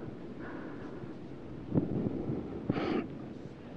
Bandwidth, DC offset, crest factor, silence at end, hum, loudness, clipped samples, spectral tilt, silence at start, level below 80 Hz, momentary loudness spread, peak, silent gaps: 7.6 kHz; under 0.1%; 22 dB; 0 s; none; -38 LUFS; under 0.1%; -9 dB/octave; 0 s; -56 dBFS; 12 LU; -14 dBFS; none